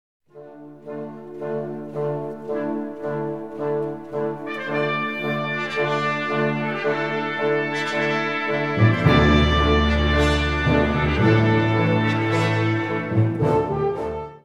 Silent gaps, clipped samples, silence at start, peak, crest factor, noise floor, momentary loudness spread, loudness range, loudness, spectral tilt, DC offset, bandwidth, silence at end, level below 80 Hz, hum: none; under 0.1%; 0.35 s; -4 dBFS; 18 dB; -42 dBFS; 12 LU; 10 LU; -21 LUFS; -7 dB/octave; 0.4%; 10.5 kHz; 0.05 s; -32 dBFS; none